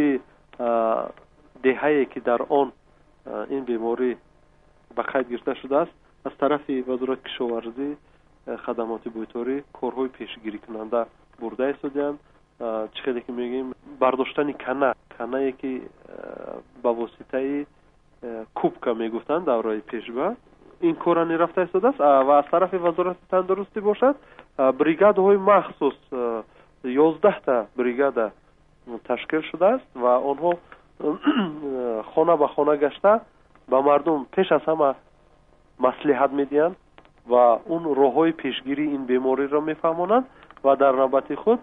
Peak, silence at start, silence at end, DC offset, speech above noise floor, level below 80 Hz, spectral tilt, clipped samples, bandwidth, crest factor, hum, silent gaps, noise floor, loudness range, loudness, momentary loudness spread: -4 dBFS; 0 s; 0 s; under 0.1%; 34 dB; -60 dBFS; -8.5 dB/octave; under 0.1%; 3.9 kHz; 20 dB; none; none; -57 dBFS; 8 LU; -23 LUFS; 15 LU